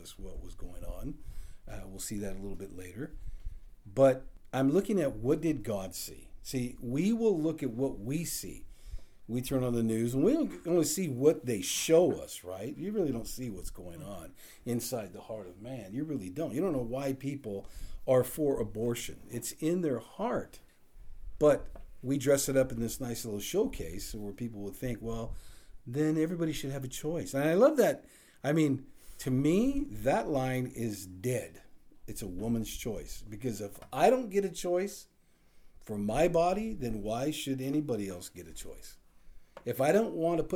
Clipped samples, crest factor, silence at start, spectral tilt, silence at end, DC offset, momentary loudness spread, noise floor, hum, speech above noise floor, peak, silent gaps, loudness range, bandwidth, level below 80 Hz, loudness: under 0.1%; 20 dB; 0 s; -5.5 dB/octave; 0 s; under 0.1%; 19 LU; -60 dBFS; none; 29 dB; -12 dBFS; none; 8 LU; over 20 kHz; -50 dBFS; -32 LUFS